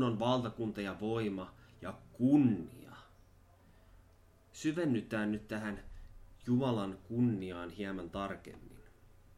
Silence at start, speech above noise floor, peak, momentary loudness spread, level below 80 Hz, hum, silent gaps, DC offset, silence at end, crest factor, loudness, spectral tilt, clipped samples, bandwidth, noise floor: 0 s; 29 dB; -18 dBFS; 19 LU; -60 dBFS; none; none; under 0.1%; 0.5 s; 20 dB; -35 LUFS; -7 dB/octave; under 0.1%; 13 kHz; -63 dBFS